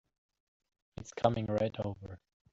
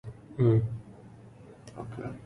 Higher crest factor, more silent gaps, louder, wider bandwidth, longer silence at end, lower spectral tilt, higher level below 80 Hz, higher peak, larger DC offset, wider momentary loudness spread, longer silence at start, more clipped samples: first, 26 dB vs 20 dB; neither; second, -34 LUFS vs -28 LUFS; first, 7.8 kHz vs 6.2 kHz; first, 0.35 s vs 0 s; second, -7 dB/octave vs -10 dB/octave; second, -62 dBFS vs -54 dBFS; about the same, -10 dBFS vs -12 dBFS; neither; second, 20 LU vs 26 LU; first, 1 s vs 0.05 s; neither